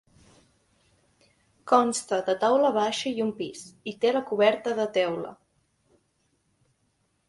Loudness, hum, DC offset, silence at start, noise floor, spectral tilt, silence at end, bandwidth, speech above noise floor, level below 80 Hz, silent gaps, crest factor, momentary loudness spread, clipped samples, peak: -25 LUFS; none; under 0.1%; 1.65 s; -72 dBFS; -3.5 dB/octave; 1.95 s; 11.5 kHz; 47 dB; -72 dBFS; none; 24 dB; 14 LU; under 0.1%; -4 dBFS